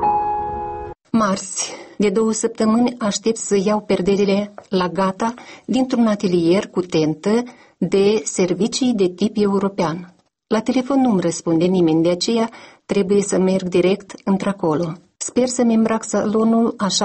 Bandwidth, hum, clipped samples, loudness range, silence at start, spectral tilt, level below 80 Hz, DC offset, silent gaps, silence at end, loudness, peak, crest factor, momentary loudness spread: 8.8 kHz; none; under 0.1%; 1 LU; 0 s; -5 dB/octave; -52 dBFS; under 0.1%; none; 0 s; -19 LUFS; -6 dBFS; 12 dB; 7 LU